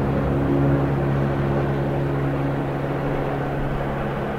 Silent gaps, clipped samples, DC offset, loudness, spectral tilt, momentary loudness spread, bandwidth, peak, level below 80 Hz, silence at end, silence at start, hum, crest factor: none; under 0.1%; 0.6%; -23 LUFS; -9 dB/octave; 5 LU; 5.4 kHz; -8 dBFS; -34 dBFS; 0 s; 0 s; none; 14 dB